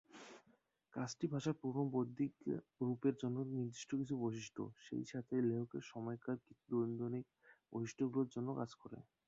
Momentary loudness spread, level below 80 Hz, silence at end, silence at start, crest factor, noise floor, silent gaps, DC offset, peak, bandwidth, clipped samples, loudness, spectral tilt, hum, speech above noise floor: 10 LU; -80 dBFS; 0.25 s; 0.15 s; 18 dB; -76 dBFS; none; under 0.1%; -24 dBFS; 7.6 kHz; under 0.1%; -43 LUFS; -7.5 dB/octave; none; 34 dB